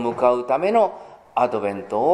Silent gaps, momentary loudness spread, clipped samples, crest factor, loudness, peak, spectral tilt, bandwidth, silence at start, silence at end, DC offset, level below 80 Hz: none; 8 LU; under 0.1%; 16 dB; -21 LUFS; -4 dBFS; -6.5 dB/octave; 10.5 kHz; 0 s; 0 s; under 0.1%; -66 dBFS